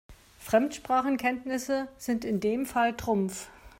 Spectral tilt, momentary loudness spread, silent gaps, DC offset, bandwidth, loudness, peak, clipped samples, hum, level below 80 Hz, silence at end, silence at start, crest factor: -5 dB/octave; 6 LU; none; under 0.1%; 16 kHz; -29 LUFS; -10 dBFS; under 0.1%; none; -56 dBFS; 0.1 s; 0.1 s; 18 dB